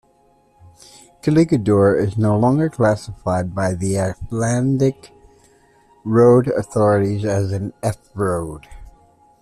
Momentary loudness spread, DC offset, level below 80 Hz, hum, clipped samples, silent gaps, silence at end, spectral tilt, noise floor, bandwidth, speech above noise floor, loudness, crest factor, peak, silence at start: 10 LU; under 0.1%; -46 dBFS; none; under 0.1%; none; 0.5 s; -7.5 dB/octave; -56 dBFS; 13.5 kHz; 39 dB; -18 LUFS; 16 dB; -2 dBFS; 1.25 s